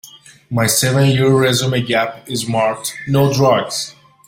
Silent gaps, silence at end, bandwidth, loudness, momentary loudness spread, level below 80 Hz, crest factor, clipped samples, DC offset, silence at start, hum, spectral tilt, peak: none; 0.35 s; 16.5 kHz; -16 LUFS; 10 LU; -50 dBFS; 14 dB; under 0.1%; under 0.1%; 0.05 s; none; -4.5 dB/octave; -2 dBFS